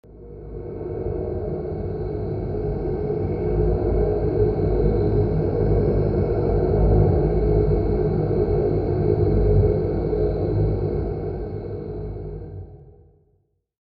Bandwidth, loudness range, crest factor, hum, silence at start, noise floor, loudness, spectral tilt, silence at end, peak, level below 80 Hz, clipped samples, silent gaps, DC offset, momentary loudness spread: 4.8 kHz; 7 LU; 16 dB; none; 0.1 s; -66 dBFS; -22 LUFS; -12.5 dB/octave; 0.9 s; -6 dBFS; -28 dBFS; under 0.1%; none; under 0.1%; 13 LU